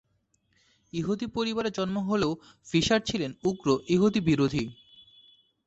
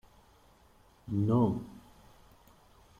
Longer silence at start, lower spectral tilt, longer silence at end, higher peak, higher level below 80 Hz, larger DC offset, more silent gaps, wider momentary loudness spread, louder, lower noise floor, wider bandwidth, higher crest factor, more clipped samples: about the same, 0.95 s vs 1.05 s; second, -5.5 dB/octave vs -10 dB/octave; second, 0.95 s vs 1.2 s; first, -12 dBFS vs -16 dBFS; about the same, -56 dBFS vs -60 dBFS; neither; neither; second, 9 LU vs 26 LU; first, -27 LUFS vs -31 LUFS; first, -72 dBFS vs -62 dBFS; second, 8.2 kHz vs 15 kHz; about the same, 16 dB vs 18 dB; neither